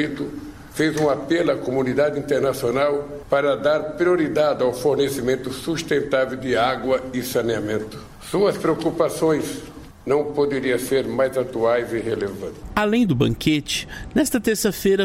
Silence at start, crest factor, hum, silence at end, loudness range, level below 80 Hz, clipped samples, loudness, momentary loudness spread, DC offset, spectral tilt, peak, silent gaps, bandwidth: 0 s; 16 dB; none; 0 s; 2 LU; -46 dBFS; under 0.1%; -21 LUFS; 7 LU; under 0.1%; -5 dB/octave; -4 dBFS; none; 16 kHz